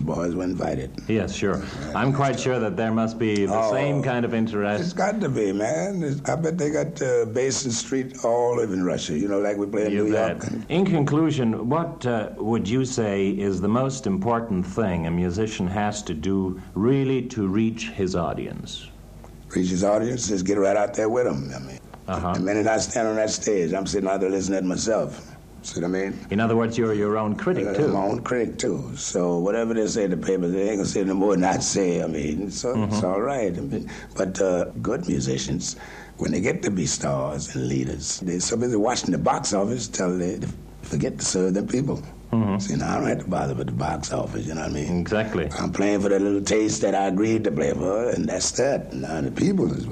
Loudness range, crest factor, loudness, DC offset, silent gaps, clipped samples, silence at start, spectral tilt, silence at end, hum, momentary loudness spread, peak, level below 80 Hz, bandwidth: 3 LU; 14 dB; -24 LUFS; under 0.1%; none; under 0.1%; 0 s; -5.5 dB/octave; 0 s; none; 7 LU; -10 dBFS; -46 dBFS; 11.5 kHz